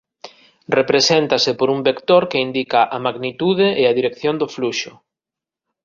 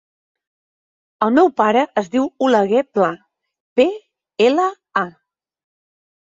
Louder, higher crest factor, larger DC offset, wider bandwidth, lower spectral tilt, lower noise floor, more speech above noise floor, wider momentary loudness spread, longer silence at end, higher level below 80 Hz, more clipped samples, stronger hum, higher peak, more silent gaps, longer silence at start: about the same, -17 LUFS vs -17 LUFS; about the same, 16 dB vs 18 dB; neither; about the same, 7.4 kHz vs 7.8 kHz; second, -4 dB/octave vs -5.5 dB/octave; first, -87 dBFS vs -68 dBFS; first, 70 dB vs 53 dB; about the same, 8 LU vs 9 LU; second, 0.95 s vs 1.2 s; first, -60 dBFS vs -66 dBFS; neither; neither; about the same, -2 dBFS vs -2 dBFS; second, none vs 3.60-3.76 s; second, 0.25 s vs 1.2 s